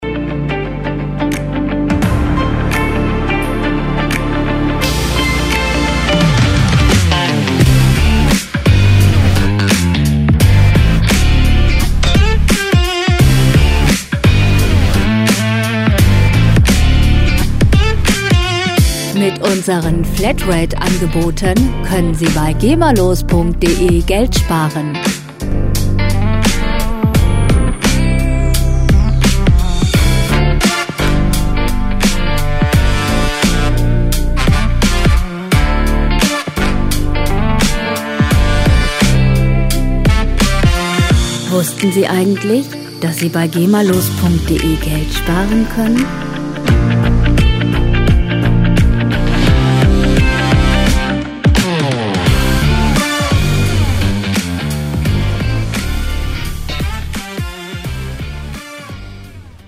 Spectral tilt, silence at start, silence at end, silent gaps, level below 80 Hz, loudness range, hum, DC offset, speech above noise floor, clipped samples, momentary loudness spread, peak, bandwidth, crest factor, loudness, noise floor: -5.5 dB/octave; 0 s; 0.15 s; none; -16 dBFS; 4 LU; none; under 0.1%; 20 dB; under 0.1%; 7 LU; 0 dBFS; 16 kHz; 12 dB; -13 LUFS; -33 dBFS